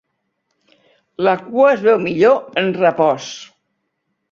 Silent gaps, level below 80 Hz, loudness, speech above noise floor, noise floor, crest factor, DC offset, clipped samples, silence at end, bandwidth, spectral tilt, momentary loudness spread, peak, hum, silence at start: none; -62 dBFS; -15 LUFS; 57 dB; -72 dBFS; 16 dB; under 0.1%; under 0.1%; 0.85 s; 7.4 kHz; -5.5 dB/octave; 9 LU; -2 dBFS; none; 1.2 s